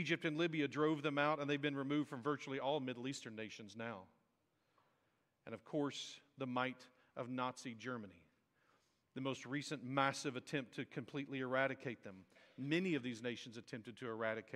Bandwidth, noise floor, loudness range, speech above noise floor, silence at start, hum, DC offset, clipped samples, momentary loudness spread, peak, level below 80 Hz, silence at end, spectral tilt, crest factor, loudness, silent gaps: 12 kHz; -82 dBFS; 7 LU; 40 dB; 0 s; none; under 0.1%; under 0.1%; 14 LU; -18 dBFS; -86 dBFS; 0 s; -5 dB/octave; 24 dB; -42 LUFS; none